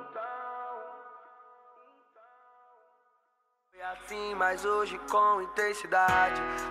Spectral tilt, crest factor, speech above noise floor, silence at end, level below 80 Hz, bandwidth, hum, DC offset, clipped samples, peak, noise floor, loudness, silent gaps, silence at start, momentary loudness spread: -3 dB/octave; 18 dB; 47 dB; 0 s; -60 dBFS; 15.5 kHz; none; under 0.1%; under 0.1%; -14 dBFS; -75 dBFS; -29 LUFS; none; 0 s; 18 LU